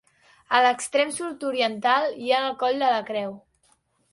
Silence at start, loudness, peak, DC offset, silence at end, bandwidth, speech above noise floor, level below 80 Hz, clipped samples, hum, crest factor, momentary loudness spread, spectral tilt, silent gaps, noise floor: 0.5 s; -23 LUFS; -4 dBFS; under 0.1%; 0.75 s; 11.5 kHz; 42 dB; -72 dBFS; under 0.1%; none; 20 dB; 9 LU; -2 dB/octave; none; -65 dBFS